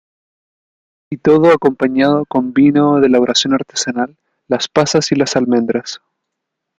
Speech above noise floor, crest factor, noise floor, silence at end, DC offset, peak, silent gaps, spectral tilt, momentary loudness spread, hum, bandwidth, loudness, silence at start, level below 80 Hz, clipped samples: 64 dB; 14 dB; -77 dBFS; 0.8 s; under 0.1%; 0 dBFS; none; -4.5 dB/octave; 10 LU; none; 9.2 kHz; -14 LUFS; 1.1 s; -54 dBFS; under 0.1%